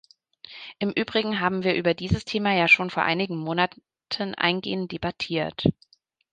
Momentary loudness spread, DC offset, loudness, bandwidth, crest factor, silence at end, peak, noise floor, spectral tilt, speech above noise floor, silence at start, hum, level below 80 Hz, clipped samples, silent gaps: 12 LU; under 0.1%; -24 LUFS; 9.4 kHz; 22 dB; 0.6 s; -4 dBFS; -49 dBFS; -6 dB/octave; 25 dB; 0.5 s; none; -50 dBFS; under 0.1%; none